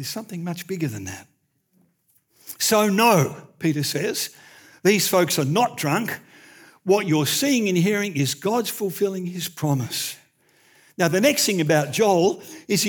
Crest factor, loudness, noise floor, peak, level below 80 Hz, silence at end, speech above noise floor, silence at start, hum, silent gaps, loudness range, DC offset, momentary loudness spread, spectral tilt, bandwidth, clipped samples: 18 dB; -21 LUFS; -65 dBFS; -4 dBFS; -74 dBFS; 0 s; 44 dB; 0 s; none; none; 3 LU; under 0.1%; 13 LU; -4 dB/octave; over 20 kHz; under 0.1%